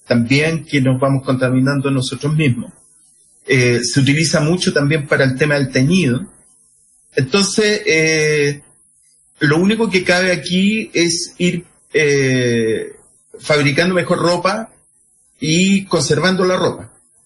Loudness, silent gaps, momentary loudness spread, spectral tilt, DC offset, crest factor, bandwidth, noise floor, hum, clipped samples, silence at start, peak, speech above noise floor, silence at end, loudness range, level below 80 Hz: -15 LUFS; none; 8 LU; -5 dB/octave; under 0.1%; 14 dB; 11.5 kHz; -55 dBFS; none; under 0.1%; 0.1 s; -2 dBFS; 40 dB; 0.4 s; 2 LU; -48 dBFS